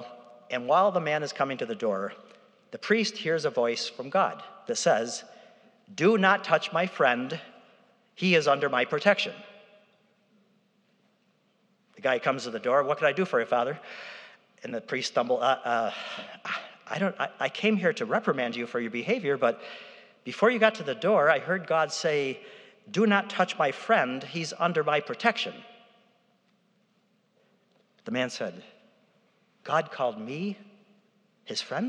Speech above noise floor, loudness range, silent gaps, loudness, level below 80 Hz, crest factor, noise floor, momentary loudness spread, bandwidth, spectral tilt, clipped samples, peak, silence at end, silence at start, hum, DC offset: 42 dB; 9 LU; none; -27 LUFS; under -90 dBFS; 24 dB; -69 dBFS; 15 LU; 10.5 kHz; -4.5 dB/octave; under 0.1%; -4 dBFS; 0 s; 0 s; none; under 0.1%